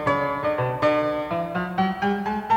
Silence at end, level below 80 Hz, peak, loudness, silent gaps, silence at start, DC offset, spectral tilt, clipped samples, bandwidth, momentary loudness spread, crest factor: 0 s; -52 dBFS; -10 dBFS; -24 LUFS; none; 0 s; under 0.1%; -7.5 dB/octave; under 0.1%; 16.5 kHz; 5 LU; 14 dB